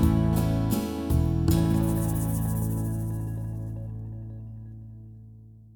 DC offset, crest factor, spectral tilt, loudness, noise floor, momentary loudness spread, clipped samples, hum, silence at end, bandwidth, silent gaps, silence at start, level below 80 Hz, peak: under 0.1%; 16 dB; -7.5 dB/octave; -27 LUFS; -48 dBFS; 19 LU; under 0.1%; none; 0.05 s; over 20 kHz; none; 0 s; -36 dBFS; -10 dBFS